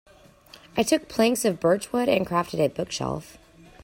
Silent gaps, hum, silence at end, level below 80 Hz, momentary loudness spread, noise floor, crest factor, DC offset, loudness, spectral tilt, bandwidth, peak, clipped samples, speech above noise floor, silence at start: none; none; 0 s; -56 dBFS; 8 LU; -51 dBFS; 18 dB; under 0.1%; -24 LUFS; -4.5 dB/octave; 16.5 kHz; -8 dBFS; under 0.1%; 27 dB; 0.75 s